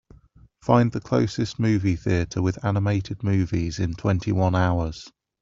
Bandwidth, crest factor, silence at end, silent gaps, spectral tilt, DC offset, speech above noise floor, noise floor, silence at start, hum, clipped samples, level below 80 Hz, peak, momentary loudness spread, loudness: 7.6 kHz; 20 dB; 0.35 s; none; -7.5 dB/octave; under 0.1%; 31 dB; -53 dBFS; 0.65 s; none; under 0.1%; -46 dBFS; -4 dBFS; 6 LU; -24 LUFS